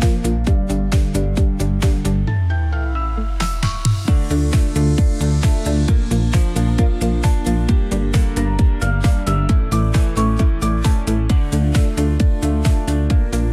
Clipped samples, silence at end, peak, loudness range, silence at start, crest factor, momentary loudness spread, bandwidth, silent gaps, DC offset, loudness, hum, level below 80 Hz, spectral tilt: under 0.1%; 0 s; -4 dBFS; 2 LU; 0 s; 10 dB; 2 LU; 13.5 kHz; none; under 0.1%; -18 LUFS; none; -18 dBFS; -6.5 dB/octave